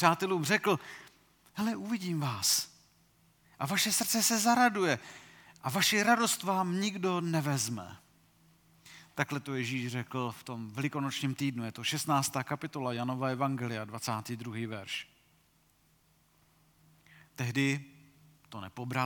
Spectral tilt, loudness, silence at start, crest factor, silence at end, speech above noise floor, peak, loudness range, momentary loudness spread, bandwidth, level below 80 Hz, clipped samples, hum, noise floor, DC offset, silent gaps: -3.5 dB/octave; -31 LUFS; 0 s; 24 dB; 0 s; 37 dB; -8 dBFS; 10 LU; 16 LU; 19 kHz; -76 dBFS; under 0.1%; none; -68 dBFS; under 0.1%; none